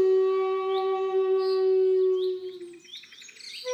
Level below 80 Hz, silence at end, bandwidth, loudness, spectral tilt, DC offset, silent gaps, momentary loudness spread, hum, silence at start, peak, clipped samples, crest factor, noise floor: -90 dBFS; 0 s; 8.6 kHz; -25 LUFS; -3.5 dB/octave; under 0.1%; none; 20 LU; none; 0 s; -16 dBFS; under 0.1%; 10 dB; -46 dBFS